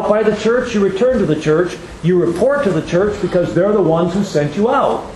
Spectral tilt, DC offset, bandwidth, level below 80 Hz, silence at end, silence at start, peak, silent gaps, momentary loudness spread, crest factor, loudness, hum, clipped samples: -7 dB/octave; under 0.1%; 12 kHz; -40 dBFS; 0 s; 0 s; 0 dBFS; none; 3 LU; 14 dB; -15 LUFS; none; under 0.1%